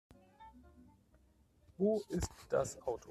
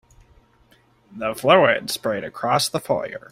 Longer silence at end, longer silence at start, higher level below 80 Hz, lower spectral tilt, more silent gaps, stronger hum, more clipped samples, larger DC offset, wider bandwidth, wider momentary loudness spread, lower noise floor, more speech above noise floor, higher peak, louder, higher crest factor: second, 0 s vs 0.15 s; second, 0.4 s vs 1.1 s; about the same, -58 dBFS vs -58 dBFS; first, -6 dB/octave vs -3.5 dB/octave; neither; neither; neither; neither; second, 14 kHz vs 16 kHz; first, 24 LU vs 11 LU; first, -69 dBFS vs -57 dBFS; second, 32 dB vs 37 dB; second, -22 dBFS vs -2 dBFS; second, -38 LUFS vs -20 LUFS; about the same, 18 dB vs 20 dB